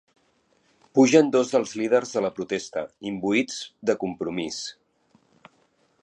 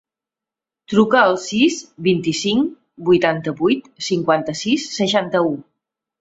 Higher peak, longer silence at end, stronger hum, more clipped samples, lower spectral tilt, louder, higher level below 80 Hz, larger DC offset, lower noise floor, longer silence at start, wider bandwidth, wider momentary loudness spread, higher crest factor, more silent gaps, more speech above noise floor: about the same, -4 dBFS vs -2 dBFS; first, 1.3 s vs 0.6 s; neither; neither; about the same, -4.5 dB/octave vs -4.5 dB/octave; second, -24 LUFS vs -18 LUFS; second, -68 dBFS vs -58 dBFS; neither; second, -66 dBFS vs -88 dBFS; about the same, 0.95 s vs 0.9 s; first, 10.5 kHz vs 8 kHz; first, 14 LU vs 7 LU; about the same, 20 dB vs 18 dB; neither; second, 42 dB vs 70 dB